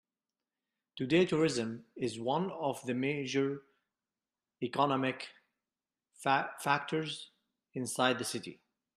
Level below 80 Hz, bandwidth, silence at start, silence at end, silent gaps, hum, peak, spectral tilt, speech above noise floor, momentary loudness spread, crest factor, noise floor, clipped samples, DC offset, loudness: -74 dBFS; 13.5 kHz; 0.95 s; 0.4 s; none; none; -12 dBFS; -4.5 dB/octave; over 57 dB; 14 LU; 22 dB; under -90 dBFS; under 0.1%; under 0.1%; -33 LUFS